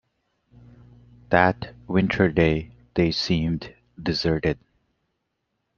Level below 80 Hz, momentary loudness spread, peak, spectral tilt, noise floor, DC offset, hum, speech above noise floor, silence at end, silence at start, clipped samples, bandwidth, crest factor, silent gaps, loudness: -46 dBFS; 12 LU; -2 dBFS; -6.5 dB/octave; -77 dBFS; under 0.1%; none; 55 dB; 1.25 s; 1.3 s; under 0.1%; 7.2 kHz; 24 dB; none; -23 LUFS